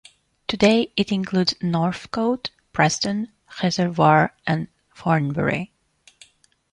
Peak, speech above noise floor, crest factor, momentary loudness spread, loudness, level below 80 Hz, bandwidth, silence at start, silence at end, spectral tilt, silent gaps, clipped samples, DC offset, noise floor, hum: -2 dBFS; 37 dB; 20 dB; 12 LU; -21 LUFS; -54 dBFS; 10.5 kHz; 0.5 s; 1.05 s; -5.5 dB/octave; none; under 0.1%; under 0.1%; -57 dBFS; none